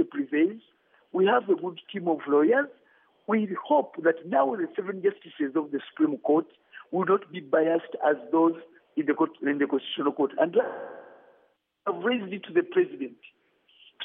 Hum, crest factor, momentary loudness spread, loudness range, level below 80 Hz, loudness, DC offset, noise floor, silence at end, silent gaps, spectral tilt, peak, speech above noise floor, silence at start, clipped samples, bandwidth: none; 18 dB; 11 LU; 3 LU; under -90 dBFS; -27 LUFS; under 0.1%; -67 dBFS; 0 s; none; -4 dB/octave; -8 dBFS; 41 dB; 0 s; under 0.1%; 3.8 kHz